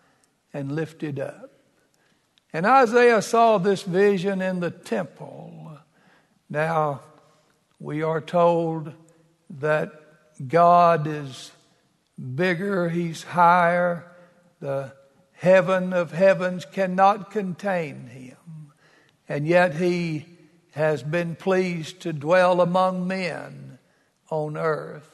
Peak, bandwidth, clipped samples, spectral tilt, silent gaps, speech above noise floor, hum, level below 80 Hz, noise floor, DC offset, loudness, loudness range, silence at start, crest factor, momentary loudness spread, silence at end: -4 dBFS; 12 kHz; under 0.1%; -6.5 dB/octave; none; 43 dB; none; -72 dBFS; -65 dBFS; under 0.1%; -22 LUFS; 6 LU; 0.55 s; 20 dB; 21 LU; 0.15 s